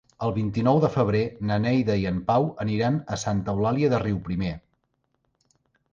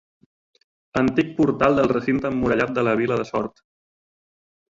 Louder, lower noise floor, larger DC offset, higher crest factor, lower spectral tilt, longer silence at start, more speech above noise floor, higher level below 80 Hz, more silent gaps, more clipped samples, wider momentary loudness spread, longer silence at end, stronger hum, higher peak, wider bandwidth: second, -25 LUFS vs -21 LUFS; second, -74 dBFS vs under -90 dBFS; neither; about the same, 16 dB vs 20 dB; about the same, -7 dB/octave vs -7.5 dB/octave; second, 0.2 s vs 0.95 s; second, 50 dB vs over 69 dB; about the same, -48 dBFS vs -50 dBFS; neither; neither; about the same, 7 LU vs 9 LU; about the same, 1.35 s vs 1.3 s; neither; second, -8 dBFS vs -4 dBFS; about the same, 7.6 kHz vs 7.6 kHz